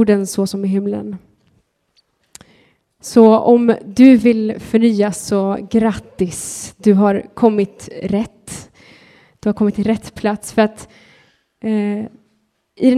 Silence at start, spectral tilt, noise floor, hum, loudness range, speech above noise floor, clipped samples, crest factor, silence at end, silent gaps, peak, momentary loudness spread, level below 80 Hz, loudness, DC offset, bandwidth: 0 s; -6.5 dB/octave; -64 dBFS; none; 8 LU; 49 dB; under 0.1%; 16 dB; 0 s; none; 0 dBFS; 17 LU; -50 dBFS; -15 LUFS; under 0.1%; 14 kHz